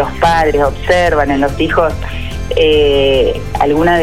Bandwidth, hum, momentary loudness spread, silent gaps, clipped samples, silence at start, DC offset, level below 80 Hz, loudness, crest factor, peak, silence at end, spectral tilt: 15.5 kHz; none; 7 LU; none; under 0.1%; 0 s; 4%; -24 dBFS; -12 LUFS; 12 dB; 0 dBFS; 0 s; -5.5 dB/octave